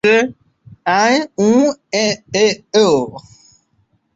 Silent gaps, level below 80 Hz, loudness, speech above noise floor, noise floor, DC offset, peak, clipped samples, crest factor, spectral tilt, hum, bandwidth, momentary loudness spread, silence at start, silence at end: none; -58 dBFS; -15 LUFS; 47 dB; -61 dBFS; under 0.1%; -2 dBFS; under 0.1%; 14 dB; -4 dB/octave; none; 8 kHz; 6 LU; 0.05 s; 0.95 s